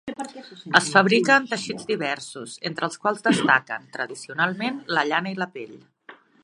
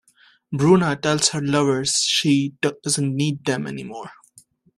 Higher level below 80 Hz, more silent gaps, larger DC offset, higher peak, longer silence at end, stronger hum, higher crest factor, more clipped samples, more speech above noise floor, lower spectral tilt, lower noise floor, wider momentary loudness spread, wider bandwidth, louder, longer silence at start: second, -68 dBFS vs -58 dBFS; neither; neither; about the same, 0 dBFS vs -2 dBFS; second, 0.3 s vs 0.65 s; neither; first, 24 dB vs 18 dB; neither; second, 26 dB vs 34 dB; about the same, -4 dB/octave vs -4 dB/octave; second, -50 dBFS vs -54 dBFS; about the same, 17 LU vs 15 LU; second, 11.5 kHz vs 13 kHz; about the same, -22 LUFS vs -20 LUFS; second, 0.05 s vs 0.5 s